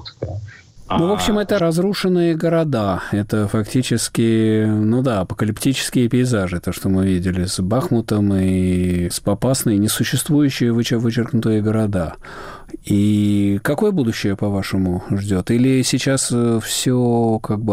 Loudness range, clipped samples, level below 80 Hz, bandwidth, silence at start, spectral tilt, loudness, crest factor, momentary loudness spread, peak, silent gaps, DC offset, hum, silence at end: 1 LU; under 0.1%; -42 dBFS; 16 kHz; 0 s; -5.5 dB/octave; -18 LUFS; 10 dB; 5 LU; -8 dBFS; none; under 0.1%; none; 0 s